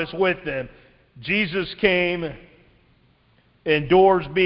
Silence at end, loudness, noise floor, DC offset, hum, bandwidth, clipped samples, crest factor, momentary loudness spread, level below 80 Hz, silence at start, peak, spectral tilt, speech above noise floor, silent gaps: 0 s; -21 LUFS; -60 dBFS; under 0.1%; none; 5.6 kHz; under 0.1%; 20 dB; 17 LU; -50 dBFS; 0 s; -2 dBFS; -10 dB/octave; 39 dB; none